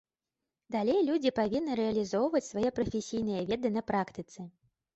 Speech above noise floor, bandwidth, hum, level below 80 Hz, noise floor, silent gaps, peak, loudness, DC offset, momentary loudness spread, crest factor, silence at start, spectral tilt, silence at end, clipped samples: 59 dB; 8.2 kHz; none; -62 dBFS; -89 dBFS; none; -16 dBFS; -31 LUFS; under 0.1%; 11 LU; 16 dB; 0.7 s; -6 dB/octave; 0.45 s; under 0.1%